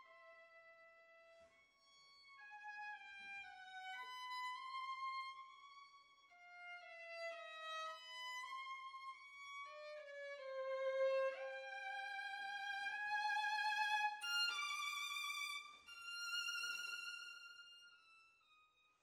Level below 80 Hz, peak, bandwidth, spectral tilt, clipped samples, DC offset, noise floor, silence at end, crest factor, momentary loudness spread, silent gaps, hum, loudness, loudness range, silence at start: under -90 dBFS; -30 dBFS; 16 kHz; 2.5 dB/octave; under 0.1%; under 0.1%; -75 dBFS; 0.4 s; 18 dB; 23 LU; none; none; -45 LUFS; 11 LU; 0 s